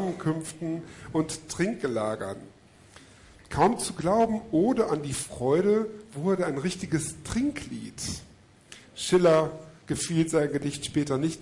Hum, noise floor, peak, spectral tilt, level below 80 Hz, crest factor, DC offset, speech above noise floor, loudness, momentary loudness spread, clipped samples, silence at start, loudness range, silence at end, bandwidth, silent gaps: none; -53 dBFS; -10 dBFS; -5.5 dB/octave; -54 dBFS; 18 dB; under 0.1%; 26 dB; -27 LUFS; 12 LU; under 0.1%; 0 s; 5 LU; 0 s; 11.5 kHz; none